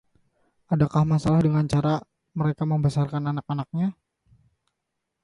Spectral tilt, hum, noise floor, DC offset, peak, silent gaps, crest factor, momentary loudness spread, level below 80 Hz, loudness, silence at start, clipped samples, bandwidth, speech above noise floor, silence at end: -8.5 dB/octave; none; -81 dBFS; under 0.1%; -8 dBFS; none; 16 dB; 9 LU; -52 dBFS; -24 LUFS; 0.7 s; under 0.1%; 11 kHz; 58 dB; 1.3 s